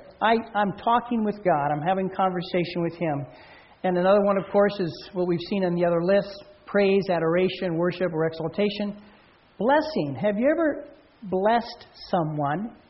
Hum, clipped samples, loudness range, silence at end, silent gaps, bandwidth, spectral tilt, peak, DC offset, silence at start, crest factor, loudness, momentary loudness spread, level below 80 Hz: none; under 0.1%; 2 LU; 0.15 s; none; 6 kHz; -5 dB/octave; -8 dBFS; under 0.1%; 0 s; 16 dB; -24 LUFS; 9 LU; -58 dBFS